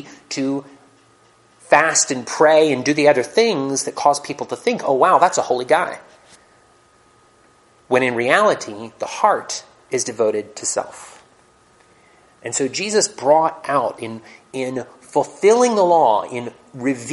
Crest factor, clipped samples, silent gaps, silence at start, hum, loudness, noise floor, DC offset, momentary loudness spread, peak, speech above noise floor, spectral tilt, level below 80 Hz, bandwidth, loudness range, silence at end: 20 dB; under 0.1%; none; 0 s; none; -18 LUFS; -54 dBFS; under 0.1%; 15 LU; 0 dBFS; 36 dB; -3 dB/octave; -68 dBFS; 11.5 kHz; 7 LU; 0 s